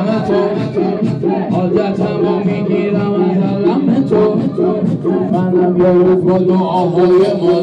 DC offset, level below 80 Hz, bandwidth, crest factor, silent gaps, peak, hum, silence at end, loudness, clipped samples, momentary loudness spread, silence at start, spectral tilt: under 0.1%; -48 dBFS; 7.6 kHz; 8 dB; none; -4 dBFS; none; 0 s; -13 LUFS; under 0.1%; 5 LU; 0 s; -9.5 dB/octave